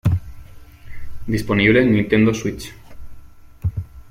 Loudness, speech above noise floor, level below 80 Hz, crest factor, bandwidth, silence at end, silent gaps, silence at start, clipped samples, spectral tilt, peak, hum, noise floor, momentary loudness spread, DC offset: -18 LUFS; 23 dB; -38 dBFS; 18 dB; 15.5 kHz; 0 s; none; 0.05 s; under 0.1%; -6.5 dB/octave; -2 dBFS; none; -39 dBFS; 20 LU; under 0.1%